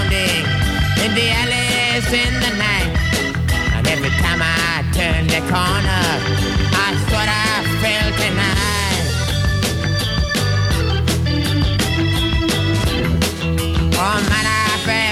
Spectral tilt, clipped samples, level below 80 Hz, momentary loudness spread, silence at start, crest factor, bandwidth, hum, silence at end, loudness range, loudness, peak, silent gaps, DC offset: -4 dB/octave; under 0.1%; -26 dBFS; 3 LU; 0 s; 16 dB; 16 kHz; none; 0 s; 1 LU; -17 LUFS; -2 dBFS; none; under 0.1%